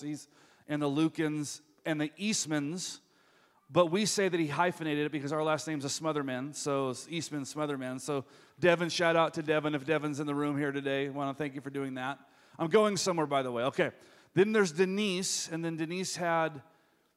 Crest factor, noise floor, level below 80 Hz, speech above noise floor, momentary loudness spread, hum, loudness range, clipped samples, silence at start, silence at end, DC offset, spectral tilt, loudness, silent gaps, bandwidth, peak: 22 dB; -66 dBFS; -78 dBFS; 35 dB; 10 LU; none; 4 LU; under 0.1%; 0 s; 0.55 s; under 0.1%; -4.5 dB/octave; -32 LUFS; none; 15.5 kHz; -10 dBFS